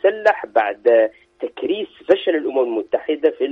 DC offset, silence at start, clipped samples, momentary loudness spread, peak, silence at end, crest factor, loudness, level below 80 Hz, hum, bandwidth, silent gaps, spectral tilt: under 0.1%; 0.05 s; under 0.1%; 9 LU; -2 dBFS; 0 s; 16 dB; -19 LUFS; -66 dBFS; none; 7 kHz; none; -5.5 dB/octave